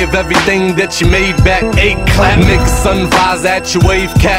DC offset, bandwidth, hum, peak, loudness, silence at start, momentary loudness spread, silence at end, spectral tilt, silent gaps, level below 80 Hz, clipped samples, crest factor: under 0.1%; 16.5 kHz; none; 0 dBFS; -10 LUFS; 0 s; 3 LU; 0 s; -5 dB/octave; none; -16 dBFS; 0.3%; 10 dB